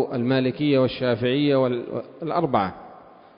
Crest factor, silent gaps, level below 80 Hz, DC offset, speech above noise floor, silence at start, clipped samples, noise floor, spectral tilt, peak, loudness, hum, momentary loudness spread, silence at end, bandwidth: 16 dB; none; -56 dBFS; under 0.1%; 25 dB; 0 s; under 0.1%; -47 dBFS; -11.5 dB/octave; -6 dBFS; -23 LUFS; none; 10 LU; 0.35 s; 5.4 kHz